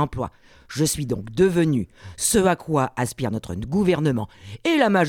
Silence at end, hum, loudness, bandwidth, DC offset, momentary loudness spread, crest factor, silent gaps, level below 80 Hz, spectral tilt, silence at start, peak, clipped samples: 0 s; none; -22 LUFS; 17.5 kHz; under 0.1%; 12 LU; 18 dB; none; -46 dBFS; -5 dB/octave; 0 s; -4 dBFS; under 0.1%